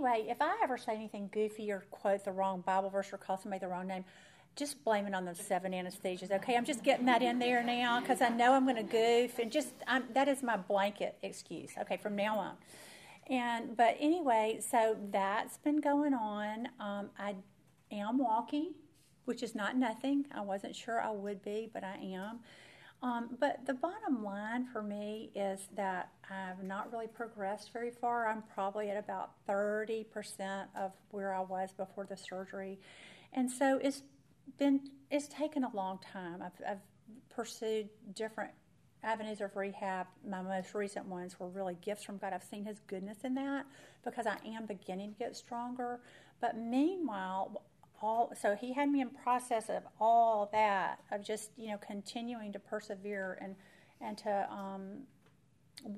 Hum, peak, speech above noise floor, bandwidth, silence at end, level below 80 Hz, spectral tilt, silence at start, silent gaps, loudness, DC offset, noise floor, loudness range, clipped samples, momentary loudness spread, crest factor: none; -14 dBFS; 32 dB; 15.5 kHz; 0 s; -82 dBFS; -4.5 dB/octave; 0 s; none; -36 LUFS; under 0.1%; -68 dBFS; 10 LU; under 0.1%; 14 LU; 22 dB